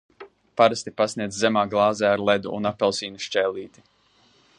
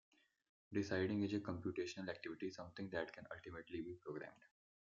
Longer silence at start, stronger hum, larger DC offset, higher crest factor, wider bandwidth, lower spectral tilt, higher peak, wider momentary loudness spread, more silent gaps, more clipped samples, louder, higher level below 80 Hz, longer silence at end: second, 0.2 s vs 0.7 s; neither; neither; about the same, 22 dB vs 20 dB; first, 11 kHz vs 7.6 kHz; second, -4 dB/octave vs -5.5 dB/octave; first, -2 dBFS vs -28 dBFS; second, 8 LU vs 12 LU; neither; neither; first, -23 LUFS vs -46 LUFS; first, -62 dBFS vs -78 dBFS; first, 0.9 s vs 0.35 s